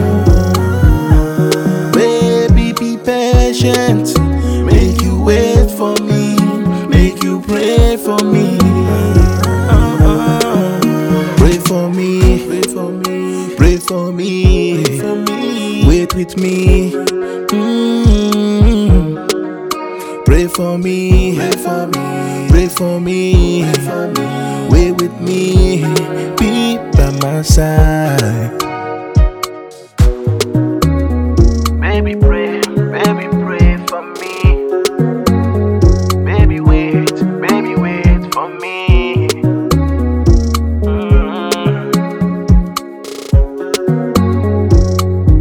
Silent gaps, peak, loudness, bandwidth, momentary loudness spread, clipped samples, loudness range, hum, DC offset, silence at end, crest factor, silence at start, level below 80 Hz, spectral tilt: none; 0 dBFS; -13 LUFS; 18.5 kHz; 6 LU; 0.7%; 3 LU; none; under 0.1%; 0 s; 12 dB; 0 s; -16 dBFS; -6.5 dB/octave